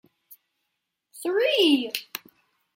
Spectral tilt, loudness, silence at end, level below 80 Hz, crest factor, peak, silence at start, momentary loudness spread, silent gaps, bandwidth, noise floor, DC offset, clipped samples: -2 dB/octave; -23 LUFS; 0.6 s; -84 dBFS; 20 dB; -8 dBFS; 0.3 s; 18 LU; none; 16.5 kHz; -80 dBFS; under 0.1%; under 0.1%